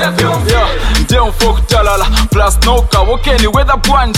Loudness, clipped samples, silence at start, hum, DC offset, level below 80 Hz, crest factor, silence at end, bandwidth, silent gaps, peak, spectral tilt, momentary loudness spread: -11 LUFS; under 0.1%; 0 s; none; under 0.1%; -12 dBFS; 10 dB; 0 s; 16 kHz; none; 0 dBFS; -4.5 dB/octave; 2 LU